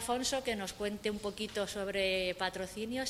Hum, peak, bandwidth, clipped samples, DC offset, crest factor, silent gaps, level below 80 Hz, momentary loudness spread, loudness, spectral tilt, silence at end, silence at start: none; -18 dBFS; 16 kHz; under 0.1%; under 0.1%; 18 dB; none; -58 dBFS; 6 LU; -35 LUFS; -3 dB/octave; 0 s; 0 s